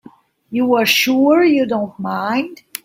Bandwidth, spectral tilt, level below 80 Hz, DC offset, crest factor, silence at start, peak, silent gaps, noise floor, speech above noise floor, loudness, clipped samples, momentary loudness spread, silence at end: 16 kHz; -3.5 dB/octave; -62 dBFS; under 0.1%; 16 dB; 0.5 s; 0 dBFS; none; -45 dBFS; 30 dB; -15 LUFS; under 0.1%; 10 LU; 0.3 s